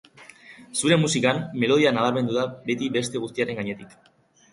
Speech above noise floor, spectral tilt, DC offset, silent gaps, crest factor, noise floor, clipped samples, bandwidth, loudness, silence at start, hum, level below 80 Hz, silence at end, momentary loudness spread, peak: 25 dB; -4.5 dB/octave; under 0.1%; none; 18 dB; -48 dBFS; under 0.1%; 11.5 kHz; -23 LUFS; 0.2 s; none; -64 dBFS; 0.65 s; 10 LU; -6 dBFS